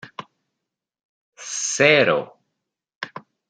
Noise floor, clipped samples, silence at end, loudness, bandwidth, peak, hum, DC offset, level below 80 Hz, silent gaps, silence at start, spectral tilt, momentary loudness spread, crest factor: -83 dBFS; under 0.1%; 0.3 s; -18 LUFS; 10 kHz; -2 dBFS; none; under 0.1%; -72 dBFS; 1.05-1.32 s, 2.95-3.01 s; 0.05 s; -2.5 dB/octave; 24 LU; 22 dB